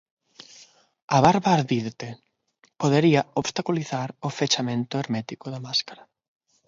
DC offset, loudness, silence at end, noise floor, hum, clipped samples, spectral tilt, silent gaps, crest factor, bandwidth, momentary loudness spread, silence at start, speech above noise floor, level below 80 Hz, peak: under 0.1%; -24 LUFS; 0.75 s; -64 dBFS; none; under 0.1%; -5 dB/octave; none; 22 dB; 7.8 kHz; 15 LU; 1.1 s; 41 dB; -60 dBFS; -2 dBFS